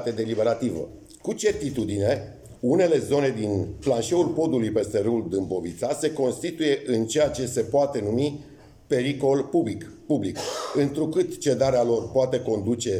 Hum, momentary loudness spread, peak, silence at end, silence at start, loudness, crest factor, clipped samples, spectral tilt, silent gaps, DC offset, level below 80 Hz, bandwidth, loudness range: none; 8 LU; -8 dBFS; 0 s; 0 s; -25 LUFS; 16 dB; under 0.1%; -5.5 dB/octave; none; under 0.1%; -54 dBFS; 16 kHz; 2 LU